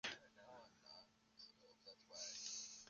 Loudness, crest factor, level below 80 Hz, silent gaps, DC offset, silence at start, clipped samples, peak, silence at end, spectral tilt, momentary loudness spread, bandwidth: -55 LUFS; 24 dB; -88 dBFS; none; under 0.1%; 0.05 s; under 0.1%; -32 dBFS; 0 s; 0.5 dB/octave; 15 LU; 10 kHz